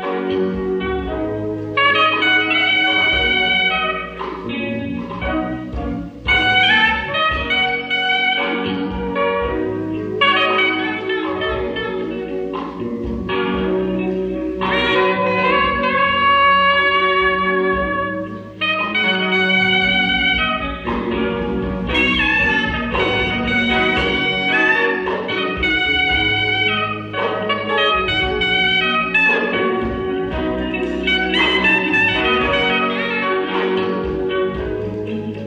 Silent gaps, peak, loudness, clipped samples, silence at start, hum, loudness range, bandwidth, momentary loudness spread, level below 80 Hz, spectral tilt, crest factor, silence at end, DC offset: none; -4 dBFS; -17 LUFS; under 0.1%; 0 s; none; 4 LU; 9.6 kHz; 10 LU; -36 dBFS; -5.5 dB/octave; 14 dB; 0 s; under 0.1%